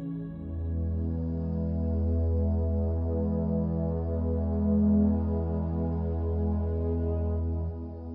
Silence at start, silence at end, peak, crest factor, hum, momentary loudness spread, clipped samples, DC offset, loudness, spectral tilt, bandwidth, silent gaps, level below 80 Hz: 0 s; 0 s; -14 dBFS; 14 dB; none; 7 LU; under 0.1%; under 0.1%; -29 LUFS; -13 dB/octave; 1.8 kHz; none; -34 dBFS